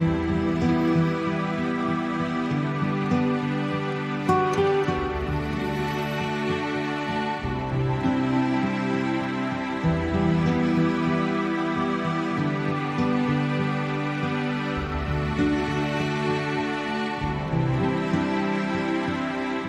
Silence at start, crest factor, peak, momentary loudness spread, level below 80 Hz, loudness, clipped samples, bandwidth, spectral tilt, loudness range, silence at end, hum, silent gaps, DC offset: 0 s; 16 dB; -10 dBFS; 5 LU; -42 dBFS; -25 LUFS; under 0.1%; 12 kHz; -7 dB/octave; 2 LU; 0 s; none; none; under 0.1%